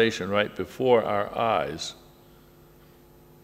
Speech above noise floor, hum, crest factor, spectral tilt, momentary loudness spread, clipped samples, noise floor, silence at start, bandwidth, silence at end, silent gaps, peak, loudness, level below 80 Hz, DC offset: 28 dB; none; 20 dB; -4.5 dB/octave; 10 LU; under 0.1%; -53 dBFS; 0 s; 15.5 kHz; 1.5 s; none; -6 dBFS; -26 LUFS; -58 dBFS; under 0.1%